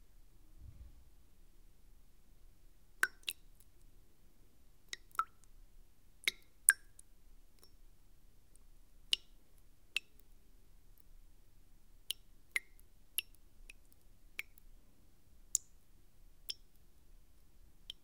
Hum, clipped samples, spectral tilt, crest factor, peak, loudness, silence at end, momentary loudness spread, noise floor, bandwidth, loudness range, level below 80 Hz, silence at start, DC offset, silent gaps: none; under 0.1%; 2 dB/octave; 42 dB; -4 dBFS; -39 LUFS; 0.1 s; 26 LU; -66 dBFS; 16 kHz; 9 LU; -62 dBFS; 0.15 s; under 0.1%; none